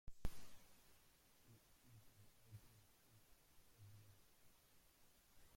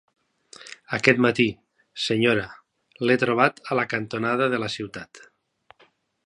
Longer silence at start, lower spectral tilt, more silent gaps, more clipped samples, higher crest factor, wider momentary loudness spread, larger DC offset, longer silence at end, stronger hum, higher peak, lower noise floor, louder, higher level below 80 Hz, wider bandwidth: second, 0.05 s vs 0.65 s; about the same, -4.5 dB/octave vs -5.5 dB/octave; neither; neither; about the same, 24 dB vs 24 dB; second, 12 LU vs 21 LU; neither; second, 0 s vs 1.1 s; neither; second, -30 dBFS vs 0 dBFS; first, -73 dBFS vs -61 dBFS; second, -63 LUFS vs -23 LUFS; about the same, -62 dBFS vs -62 dBFS; first, 16.5 kHz vs 11 kHz